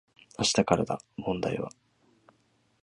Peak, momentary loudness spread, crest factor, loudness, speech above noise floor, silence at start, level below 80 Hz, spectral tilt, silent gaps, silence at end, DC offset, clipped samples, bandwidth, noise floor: -6 dBFS; 13 LU; 26 dB; -29 LUFS; 41 dB; 0.4 s; -58 dBFS; -4 dB/octave; none; 1.15 s; under 0.1%; under 0.1%; 11.5 kHz; -69 dBFS